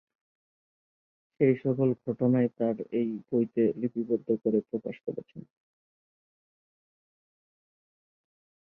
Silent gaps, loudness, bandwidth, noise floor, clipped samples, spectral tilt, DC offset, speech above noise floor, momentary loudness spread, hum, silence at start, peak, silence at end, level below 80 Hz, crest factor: none; -29 LUFS; 3.4 kHz; under -90 dBFS; under 0.1%; -12 dB/octave; under 0.1%; over 62 dB; 11 LU; none; 1.4 s; -10 dBFS; 3.25 s; -74 dBFS; 20 dB